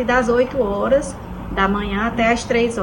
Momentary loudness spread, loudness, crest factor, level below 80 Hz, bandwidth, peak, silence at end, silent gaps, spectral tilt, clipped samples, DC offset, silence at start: 8 LU; -19 LUFS; 14 dB; -34 dBFS; 16.5 kHz; -4 dBFS; 0 s; none; -5 dB/octave; under 0.1%; under 0.1%; 0 s